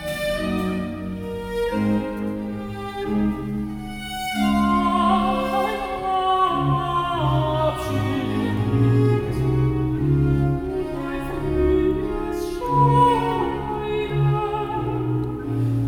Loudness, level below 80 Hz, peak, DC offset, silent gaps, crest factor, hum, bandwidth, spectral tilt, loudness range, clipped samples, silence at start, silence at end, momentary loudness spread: -22 LUFS; -36 dBFS; -6 dBFS; under 0.1%; none; 16 dB; none; 17.5 kHz; -7.5 dB/octave; 5 LU; under 0.1%; 0 s; 0 s; 9 LU